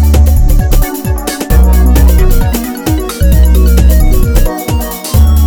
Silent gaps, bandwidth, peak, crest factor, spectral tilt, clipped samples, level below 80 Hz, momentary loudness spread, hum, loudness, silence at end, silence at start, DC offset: none; over 20 kHz; 0 dBFS; 6 dB; -6 dB/octave; 1%; -8 dBFS; 7 LU; none; -10 LUFS; 0 s; 0 s; under 0.1%